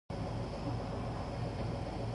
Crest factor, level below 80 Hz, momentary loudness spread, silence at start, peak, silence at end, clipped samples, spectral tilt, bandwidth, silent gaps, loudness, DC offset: 12 dB; -46 dBFS; 1 LU; 0.1 s; -26 dBFS; 0 s; under 0.1%; -7.5 dB/octave; 11.5 kHz; none; -39 LUFS; under 0.1%